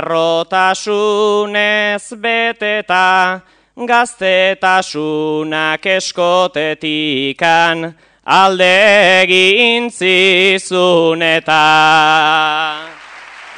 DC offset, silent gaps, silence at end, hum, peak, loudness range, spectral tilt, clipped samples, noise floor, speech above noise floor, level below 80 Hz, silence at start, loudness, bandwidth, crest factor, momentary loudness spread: under 0.1%; none; 0 s; none; 0 dBFS; 5 LU; -3 dB/octave; 0.3%; -34 dBFS; 22 dB; -60 dBFS; 0 s; -11 LUFS; 10.5 kHz; 12 dB; 9 LU